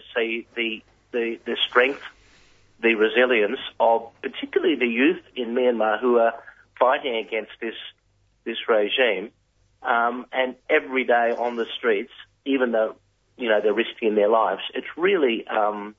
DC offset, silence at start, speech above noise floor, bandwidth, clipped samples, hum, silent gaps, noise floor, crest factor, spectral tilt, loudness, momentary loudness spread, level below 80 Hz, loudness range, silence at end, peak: under 0.1%; 0.1 s; 42 dB; 7.2 kHz; under 0.1%; none; none; -65 dBFS; 20 dB; -5.5 dB/octave; -23 LUFS; 13 LU; -68 dBFS; 3 LU; 0.05 s; -4 dBFS